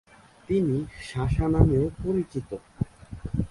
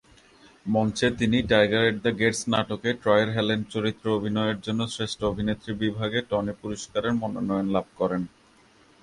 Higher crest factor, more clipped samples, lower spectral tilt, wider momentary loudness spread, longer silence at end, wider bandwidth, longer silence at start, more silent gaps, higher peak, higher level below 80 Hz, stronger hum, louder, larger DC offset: about the same, 24 dB vs 20 dB; neither; first, -9 dB/octave vs -5 dB/octave; first, 13 LU vs 8 LU; second, 0.05 s vs 0.75 s; about the same, 11.5 kHz vs 11.5 kHz; second, 0.5 s vs 0.65 s; neither; first, -2 dBFS vs -6 dBFS; first, -36 dBFS vs -50 dBFS; neither; about the same, -27 LUFS vs -25 LUFS; neither